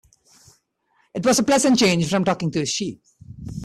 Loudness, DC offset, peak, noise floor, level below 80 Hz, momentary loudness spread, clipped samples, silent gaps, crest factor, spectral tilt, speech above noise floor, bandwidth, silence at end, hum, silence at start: -19 LUFS; under 0.1%; -6 dBFS; -65 dBFS; -52 dBFS; 17 LU; under 0.1%; none; 16 dB; -4 dB/octave; 46 dB; 14.5 kHz; 0 s; none; 1.15 s